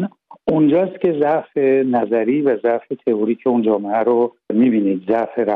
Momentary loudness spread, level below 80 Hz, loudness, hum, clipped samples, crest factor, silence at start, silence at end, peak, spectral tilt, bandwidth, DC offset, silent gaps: 5 LU; -62 dBFS; -18 LUFS; none; under 0.1%; 12 dB; 0 s; 0 s; -4 dBFS; -10.5 dB/octave; 4.1 kHz; under 0.1%; none